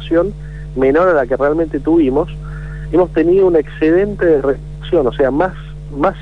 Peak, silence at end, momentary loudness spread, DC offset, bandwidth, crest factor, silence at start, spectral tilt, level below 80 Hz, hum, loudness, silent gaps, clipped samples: -4 dBFS; 0 s; 14 LU; 1%; 5.8 kHz; 12 dB; 0 s; -8.5 dB/octave; -30 dBFS; none; -14 LUFS; none; under 0.1%